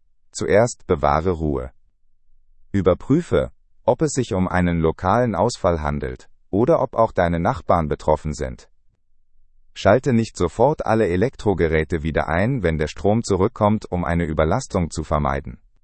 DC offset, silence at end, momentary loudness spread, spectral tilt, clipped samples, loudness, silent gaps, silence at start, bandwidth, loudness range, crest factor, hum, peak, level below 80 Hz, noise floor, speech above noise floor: under 0.1%; 0.3 s; 9 LU; -6.5 dB/octave; under 0.1%; -20 LUFS; none; 0.35 s; 8.8 kHz; 2 LU; 18 dB; none; -2 dBFS; -38 dBFS; -55 dBFS; 35 dB